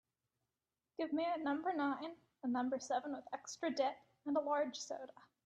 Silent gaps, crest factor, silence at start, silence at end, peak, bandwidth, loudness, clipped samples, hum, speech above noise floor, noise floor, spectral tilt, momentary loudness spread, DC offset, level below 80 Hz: none; 18 dB; 1 s; 0.2 s; -24 dBFS; 8.8 kHz; -40 LUFS; under 0.1%; none; over 50 dB; under -90 dBFS; -3 dB/octave; 11 LU; under 0.1%; -86 dBFS